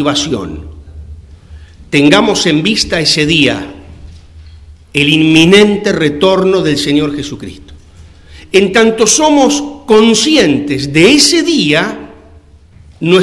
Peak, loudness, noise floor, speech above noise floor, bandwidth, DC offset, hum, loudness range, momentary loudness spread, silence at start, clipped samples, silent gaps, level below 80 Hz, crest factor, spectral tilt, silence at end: 0 dBFS; -9 LUFS; -39 dBFS; 30 dB; 12 kHz; under 0.1%; none; 4 LU; 13 LU; 0 s; 1%; none; -38 dBFS; 10 dB; -3.5 dB/octave; 0 s